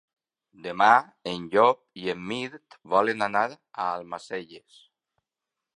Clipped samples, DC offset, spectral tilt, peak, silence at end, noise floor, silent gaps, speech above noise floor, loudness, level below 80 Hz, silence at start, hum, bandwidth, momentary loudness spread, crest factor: under 0.1%; under 0.1%; -5 dB/octave; -4 dBFS; 1.2 s; -87 dBFS; none; 62 dB; -25 LUFS; -70 dBFS; 0.65 s; none; 11 kHz; 17 LU; 24 dB